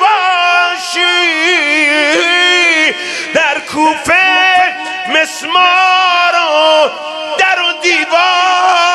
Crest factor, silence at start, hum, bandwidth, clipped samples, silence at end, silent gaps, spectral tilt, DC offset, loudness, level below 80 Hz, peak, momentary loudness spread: 10 dB; 0 s; none; 13 kHz; under 0.1%; 0 s; none; -0.5 dB/octave; under 0.1%; -9 LUFS; -56 dBFS; 0 dBFS; 6 LU